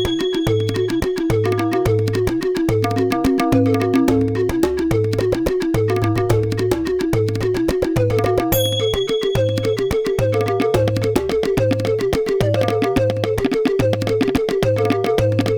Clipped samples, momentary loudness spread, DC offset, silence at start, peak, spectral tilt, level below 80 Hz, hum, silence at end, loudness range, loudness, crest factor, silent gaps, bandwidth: under 0.1%; 3 LU; under 0.1%; 0 s; -2 dBFS; -6.5 dB/octave; -36 dBFS; none; 0 s; 1 LU; -18 LUFS; 16 dB; none; over 20 kHz